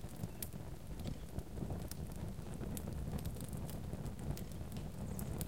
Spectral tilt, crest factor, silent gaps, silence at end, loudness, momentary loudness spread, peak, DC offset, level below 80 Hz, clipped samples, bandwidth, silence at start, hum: -6 dB/octave; 22 dB; none; 0 s; -46 LUFS; 3 LU; -22 dBFS; 0.3%; -50 dBFS; under 0.1%; 17 kHz; 0 s; none